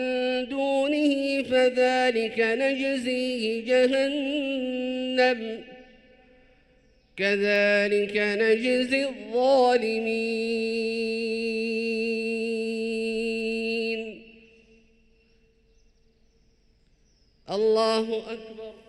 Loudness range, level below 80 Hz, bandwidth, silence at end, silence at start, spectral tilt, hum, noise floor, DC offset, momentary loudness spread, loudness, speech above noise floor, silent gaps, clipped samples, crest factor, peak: 8 LU; -62 dBFS; 11.5 kHz; 0.15 s; 0 s; -4.5 dB/octave; none; -63 dBFS; under 0.1%; 8 LU; -25 LUFS; 38 dB; none; under 0.1%; 16 dB; -10 dBFS